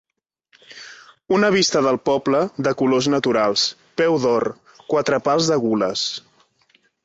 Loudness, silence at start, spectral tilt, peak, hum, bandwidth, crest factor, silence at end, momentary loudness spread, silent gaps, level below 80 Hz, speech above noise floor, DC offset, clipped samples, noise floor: -19 LUFS; 0.7 s; -4 dB/octave; -4 dBFS; none; 8.2 kHz; 16 dB; 0.85 s; 14 LU; none; -60 dBFS; 47 dB; under 0.1%; under 0.1%; -66 dBFS